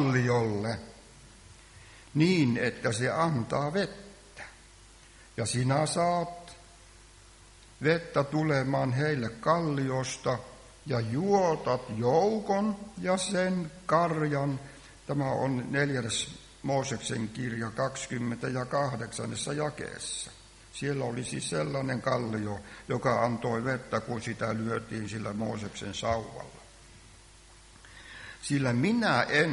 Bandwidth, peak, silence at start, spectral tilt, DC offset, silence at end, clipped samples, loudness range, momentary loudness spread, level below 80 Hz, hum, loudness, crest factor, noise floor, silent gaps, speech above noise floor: 11.5 kHz; -10 dBFS; 0 s; -5.5 dB/octave; under 0.1%; 0 s; under 0.1%; 5 LU; 14 LU; -58 dBFS; none; -30 LUFS; 20 dB; -54 dBFS; none; 25 dB